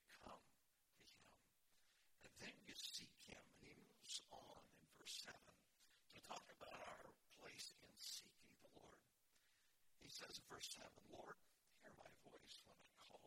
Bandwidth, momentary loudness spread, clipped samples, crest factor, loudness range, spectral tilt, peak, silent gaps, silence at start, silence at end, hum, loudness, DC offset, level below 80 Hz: 16.5 kHz; 14 LU; under 0.1%; 24 dB; 3 LU; -1 dB/octave; -40 dBFS; none; 0 s; 0 s; none; -59 LUFS; under 0.1%; -86 dBFS